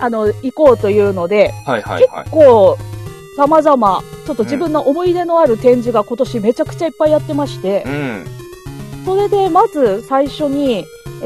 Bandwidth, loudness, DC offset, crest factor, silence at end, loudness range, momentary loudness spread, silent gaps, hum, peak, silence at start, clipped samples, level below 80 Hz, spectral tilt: 14 kHz; -13 LUFS; 0.2%; 14 dB; 0 s; 5 LU; 14 LU; none; none; 0 dBFS; 0 s; under 0.1%; -42 dBFS; -7 dB/octave